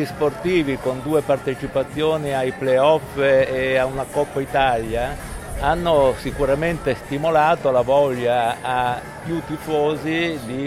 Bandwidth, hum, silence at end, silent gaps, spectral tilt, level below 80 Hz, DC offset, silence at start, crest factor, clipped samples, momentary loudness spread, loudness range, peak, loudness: 15.5 kHz; none; 0 s; none; -6 dB/octave; -40 dBFS; under 0.1%; 0 s; 16 dB; under 0.1%; 7 LU; 2 LU; -4 dBFS; -20 LUFS